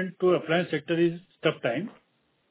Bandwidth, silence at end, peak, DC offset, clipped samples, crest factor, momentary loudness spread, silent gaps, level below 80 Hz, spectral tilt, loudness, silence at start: 4 kHz; 0.6 s; -10 dBFS; under 0.1%; under 0.1%; 18 dB; 6 LU; none; -76 dBFS; -10 dB/octave; -27 LUFS; 0 s